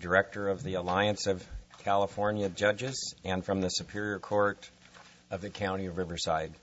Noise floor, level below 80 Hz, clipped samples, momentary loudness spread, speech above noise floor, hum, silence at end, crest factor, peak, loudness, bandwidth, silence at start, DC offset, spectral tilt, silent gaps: -56 dBFS; -56 dBFS; under 0.1%; 10 LU; 25 dB; none; 0.05 s; 22 dB; -10 dBFS; -32 LUFS; 8 kHz; 0 s; under 0.1%; -4.5 dB/octave; none